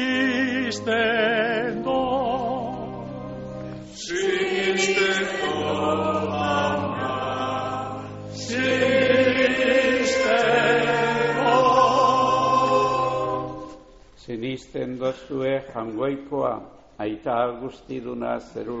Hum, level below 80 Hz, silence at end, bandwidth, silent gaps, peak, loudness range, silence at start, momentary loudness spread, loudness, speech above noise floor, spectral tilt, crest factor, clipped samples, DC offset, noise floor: none; -52 dBFS; 0 s; 8 kHz; none; -6 dBFS; 9 LU; 0 s; 15 LU; -22 LUFS; 22 dB; -3 dB/octave; 18 dB; under 0.1%; under 0.1%; -48 dBFS